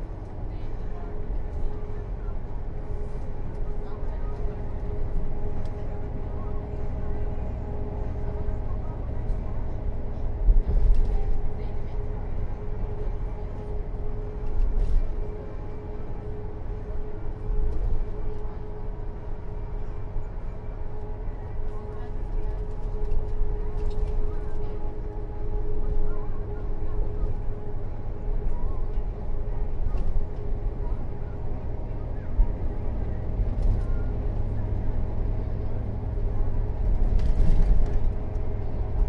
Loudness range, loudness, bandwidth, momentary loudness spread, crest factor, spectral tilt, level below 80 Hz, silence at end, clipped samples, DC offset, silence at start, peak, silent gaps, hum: 6 LU; -33 LUFS; 2.8 kHz; 9 LU; 16 dB; -9.5 dB/octave; -26 dBFS; 0 s; under 0.1%; under 0.1%; 0 s; -8 dBFS; none; none